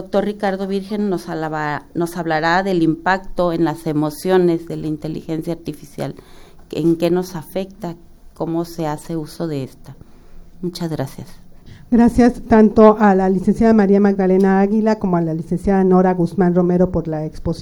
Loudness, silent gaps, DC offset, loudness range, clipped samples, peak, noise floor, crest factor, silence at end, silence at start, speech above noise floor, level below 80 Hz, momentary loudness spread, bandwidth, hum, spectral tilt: -17 LUFS; none; under 0.1%; 12 LU; under 0.1%; 0 dBFS; -38 dBFS; 18 dB; 0 s; 0 s; 21 dB; -38 dBFS; 14 LU; 17.5 kHz; none; -7.5 dB/octave